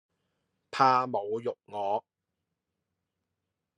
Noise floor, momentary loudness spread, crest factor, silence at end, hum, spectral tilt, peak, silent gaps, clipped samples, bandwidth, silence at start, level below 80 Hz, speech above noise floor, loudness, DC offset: -85 dBFS; 12 LU; 24 dB; 1.8 s; none; -5.5 dB/octave; -10 dBFS; none; under 0.1%; 10 kHz; 0.75 s; -84 dBFS; 57 dB; -29 LUFS; under 0.1%